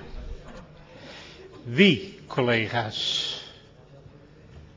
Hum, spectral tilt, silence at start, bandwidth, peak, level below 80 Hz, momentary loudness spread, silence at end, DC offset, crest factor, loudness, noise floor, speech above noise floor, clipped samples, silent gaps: none; -5 dB/octave; 0 s; 7.6 kHz; -4 dBFS; -48 dBFS; 25 LU; 0.15 s; under 0.1%; 24 dB; -24 LUFS; -50 dBFS; 27 dB; under 0.1%; none